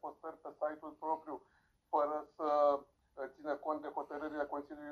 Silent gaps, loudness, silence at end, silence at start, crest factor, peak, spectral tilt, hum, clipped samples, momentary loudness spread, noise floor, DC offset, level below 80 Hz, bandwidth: none; -38 LUFS; 0 s; 0.05 s; 20 dB; -20 dBFS; -6 dB/octave; none; under 0.1%; 17 LU; -73 dBFS; under 0.1%; -78 dBFS; 6.6 kHz